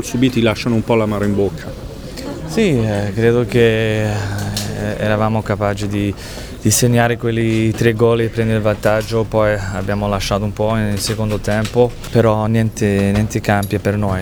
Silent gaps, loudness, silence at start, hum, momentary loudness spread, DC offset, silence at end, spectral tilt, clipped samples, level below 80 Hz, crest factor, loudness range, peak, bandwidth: none; -16 LUFS; 0 s; none; 7 LU; under 0.1%; 0 s; -5.5 dB/octave; under 0.1%; -34 dBFS; 16 dB; 2 LU; 0 dBFS; over 20 kHz